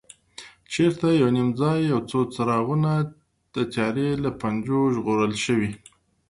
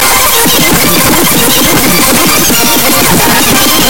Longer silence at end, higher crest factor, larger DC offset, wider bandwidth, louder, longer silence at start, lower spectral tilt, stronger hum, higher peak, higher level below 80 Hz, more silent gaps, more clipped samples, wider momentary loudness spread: first, 0.55 s vs 0 s; first, 14 dB vs 8 dB; second, under 0.1% vs 10%; second, 11.5 kHz vs over 20 kHz; second, -23 LUFS vs -5 LUFS; first, 0.4 s vs 0 s; first, -6.5 dB/octave vs -2 dB/octave; neither; second, -8 dBFS vs 0 dBFS; second, -56 dBFS vs -26 dBFS; neither; second, under 0.1% vs 2%; first, 13 LU vs 1 LU